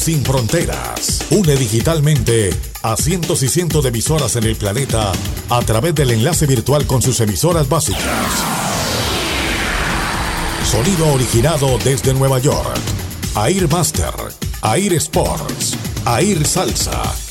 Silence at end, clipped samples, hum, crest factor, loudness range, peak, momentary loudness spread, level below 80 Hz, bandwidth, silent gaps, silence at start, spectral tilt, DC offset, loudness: 0 s; under 0.1%; none; 14 dB; 2 LU; -2 dBFS; 5 LU; -28 dBFS; 17 kHz; none; 0 s; -4.5 dB/octave; under 0.1%; -16 LUFS